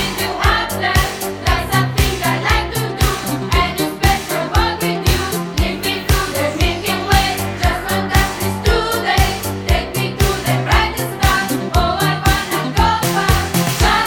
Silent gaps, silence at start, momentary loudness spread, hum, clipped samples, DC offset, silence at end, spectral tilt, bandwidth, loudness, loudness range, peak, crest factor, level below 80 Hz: none; 0 s; 4 LU; none; under 0.1%; under 0.1%; 0 s; -4 dB/octave; 18.5 kHz; -16 LUFS; 1 LU; 0 dBFS; 16 dB; -22 dBFS